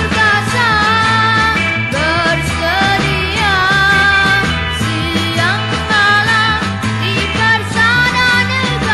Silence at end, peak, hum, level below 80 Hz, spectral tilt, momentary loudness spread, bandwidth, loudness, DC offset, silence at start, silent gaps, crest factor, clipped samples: 0 s; 0 dBFS; none; -30 dBFS; -4 dB/octave; 6 LU; 13 kHz; -12 LUFS; under 0.1%; 0 s; none; 12 dB; under 0.1%